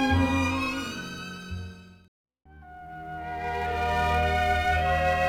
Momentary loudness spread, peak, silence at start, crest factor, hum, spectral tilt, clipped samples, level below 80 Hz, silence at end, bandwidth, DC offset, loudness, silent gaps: 17 LU; -12 dBFS; 0 s; 16 dB; none; -5.5 dB/octave; under 0.1%; -42 dBFS; 0 s; 16 kHz; under 0.1%; -27 LUFS; 2.08-2.24 s